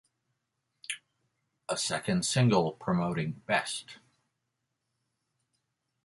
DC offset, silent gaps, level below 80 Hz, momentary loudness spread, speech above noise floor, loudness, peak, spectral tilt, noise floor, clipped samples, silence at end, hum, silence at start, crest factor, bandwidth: under 0.1%; none; -66 dBFS; 15 LU; 53 dB; -30 LUFS; -12 dBFS; -4.5 dB/octave; -83 dBFS; under 0.1%; 2.1 s; none; 0.9 s; 22 dB; 11.5 kHz